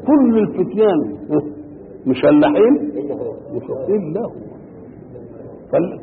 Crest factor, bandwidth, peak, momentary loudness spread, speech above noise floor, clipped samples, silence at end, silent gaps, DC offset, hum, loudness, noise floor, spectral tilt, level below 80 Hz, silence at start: 14 dB; 4.5 kHz; -4 dBFS; 24 LU; 22 dB; under 0.1%; 0 s; none; under 0.1%; none; -17 LUFS; -37 dBFS; -12.5 dB/octave; -52 dBFS; 0 s